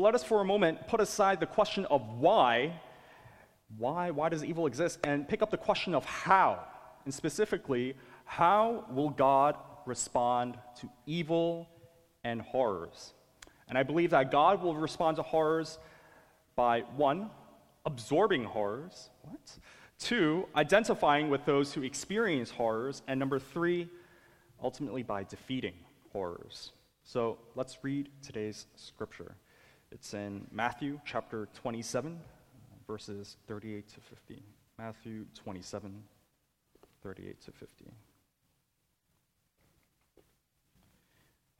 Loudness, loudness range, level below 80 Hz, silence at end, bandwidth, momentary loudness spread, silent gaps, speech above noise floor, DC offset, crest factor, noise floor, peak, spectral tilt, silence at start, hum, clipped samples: -32 LUFS; 16 LU; -66 dBFS; 3.95 s; 15.5 kHz; 20 LU; none; 47 dB; under 0.1%; 24 dB; -79 dBFS; -10 dBFS; -5 dB/octave; 0 s; none; under 0.1%